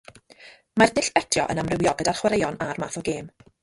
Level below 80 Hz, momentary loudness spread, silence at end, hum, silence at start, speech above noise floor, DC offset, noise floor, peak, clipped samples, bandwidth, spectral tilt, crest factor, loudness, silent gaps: -52 dBFS; 10 LU; 0.35 s; none; 0.4 s; 27 dB; under 0.1%; -50 dBFS; -2 dBFS; under 0.1%; 11.5 kHz; -4 dB/octave; 22 dB; -23 LUFS; none